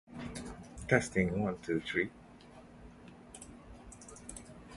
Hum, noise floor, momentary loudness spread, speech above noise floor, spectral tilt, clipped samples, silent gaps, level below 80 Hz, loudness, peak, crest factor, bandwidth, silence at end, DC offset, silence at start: none; -55 dBFS; 24 LU; 23 dB; -5.5 dB/octave; under 0.1%; none; -56 dBFS; -34 LUFS; -10 dBFS; 28 dB; 11.5 kHz; 0 s; under 0.1%; 0.1 s